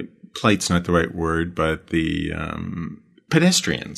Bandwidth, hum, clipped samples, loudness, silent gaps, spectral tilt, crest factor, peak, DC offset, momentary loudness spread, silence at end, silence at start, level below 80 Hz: 13.5 kHz; none; under 0.1%; -21 LUFS; none; -4.5 dB/octave; 20 dB; -2 dBFS; under 0.1%; 13 LU; 0 s; 0 s; -40 dBFS